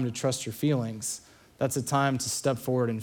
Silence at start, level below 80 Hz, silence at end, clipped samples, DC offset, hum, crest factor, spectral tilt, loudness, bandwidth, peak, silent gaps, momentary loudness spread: 0 s; -66 dBFS; 0 s; under 0.1%; under 0.1%; none; 18 dB; -5 dB/octave; -29 LUFS; 19.5 kHz; -10 dBFS; none; 7 LU